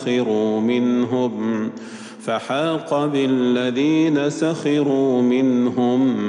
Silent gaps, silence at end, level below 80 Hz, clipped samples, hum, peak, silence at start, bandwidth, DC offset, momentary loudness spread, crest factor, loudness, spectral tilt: none; 0 s; -78 dBFS; under 0.1%; none; -8 dBFS; 0 s; 10.5 kHz; under 0.1%; 8 LU; 12 dB; -19 LUFS; -6.5 dB/octave